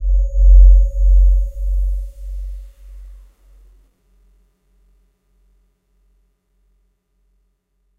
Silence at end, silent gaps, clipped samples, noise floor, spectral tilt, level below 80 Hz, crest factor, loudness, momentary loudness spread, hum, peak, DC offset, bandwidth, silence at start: 4.95 s; none; under 0.1%; -65 dBFS; -9.5 dB/octave; -16 dBFS; 16 dB; -16 LUFS; 22 LU; none; 0 dBFS; under 0.1%; 0.6 kHz; 0 s